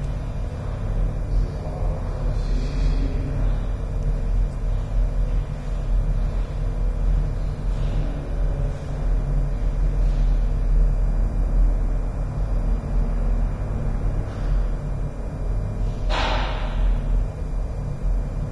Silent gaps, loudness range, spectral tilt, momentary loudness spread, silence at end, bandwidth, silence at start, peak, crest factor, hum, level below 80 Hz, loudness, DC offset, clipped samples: none; 2 LU; -7.5 dB/octave; 5 LU; 0 s; 6.2 kHz; 0 s; -10 dBFS; 12 dB; none; -22 dBFS; -26 LUFS; under 0.1%; under 0.1%